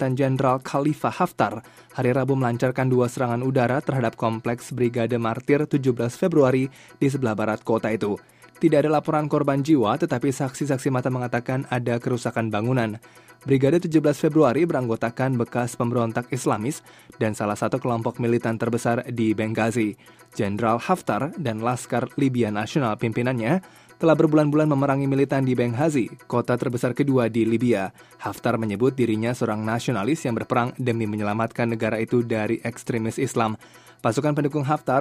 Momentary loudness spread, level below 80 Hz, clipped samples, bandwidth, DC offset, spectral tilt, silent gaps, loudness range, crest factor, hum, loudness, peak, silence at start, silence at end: 7 LU; -60 dBFS; under 0.1%; 15.5 kHz; under 0.1%; -7 dB/octave; none; 3 LU; 18 dB; none; -23 LUFS; -4 dBFS; 0 s; 0 s